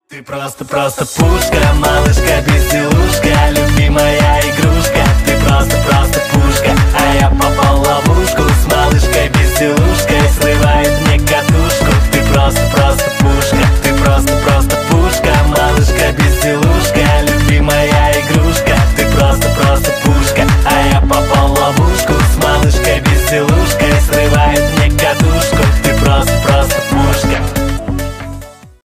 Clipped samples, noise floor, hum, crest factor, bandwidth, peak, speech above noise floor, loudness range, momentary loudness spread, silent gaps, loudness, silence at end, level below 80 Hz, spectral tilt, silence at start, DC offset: under 0.1%; -30 dBFS; none; 10 dB; 16 kHz; 0 dBFS; 20 dB; 0 LU; 2 LU; none; -11 LUFS; 0.2 s; -14 dBFS; -5 dB/octave; 0.1 s; under 0.1%